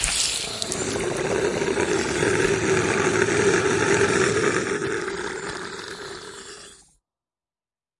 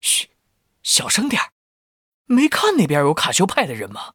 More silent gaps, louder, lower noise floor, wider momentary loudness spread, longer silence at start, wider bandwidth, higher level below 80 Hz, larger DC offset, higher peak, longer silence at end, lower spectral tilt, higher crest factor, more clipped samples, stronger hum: second, none vs 1.52-2.25 s; second, -22 LUFS vs -18 LUFS; first, under -90 dBFS vs -69 dBFS; about the same, 15 LU vs 13 LU; about the same, 0 s vs 0.05 s; second, 11.5 kHz vs 20 kHz; first, -48 dBFS vs -60 dBFS; neither; about the same, -4 dBFS vs -2 dBFS; first, 1.25 s vs 0.05 s; about the same, -3.5 dB/octave vs -3 dB/octave; about the same, 20 dB vs 18 dB; neither; neither